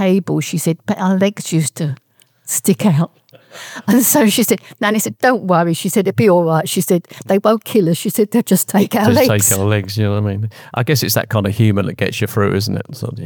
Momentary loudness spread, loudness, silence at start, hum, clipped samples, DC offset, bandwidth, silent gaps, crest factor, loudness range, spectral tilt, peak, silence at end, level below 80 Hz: 9 LU; -15 LUFS; 0 s; none; under 0.1%; under 0.1%; 19.5 kHz; none; 14 dB; 3 LU; -5 dB/octave; 0 dBFS; 0 s; -60 dBFS